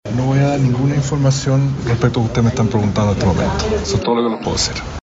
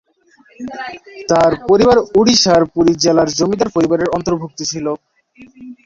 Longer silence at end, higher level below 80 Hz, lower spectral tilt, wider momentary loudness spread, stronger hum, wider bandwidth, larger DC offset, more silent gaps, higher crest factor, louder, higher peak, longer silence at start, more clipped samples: about the same, 0.05 s vs 0.1 s; first, -32 dBFS vs -44 dBFS; first, -6 dB/octave vs -4.5 dB/octave; second, 3 LU vs 17 LU; neither; about the same, 8 kHz vs 7.8 kHz; neither; neither; about the same, 14 dB vs 14 dB; about the same, -16 LUFS vs -14 LUFS; about the same, 0 dBFS vs 0 dBFS; second, 0.05 s vs 0.6 s; neither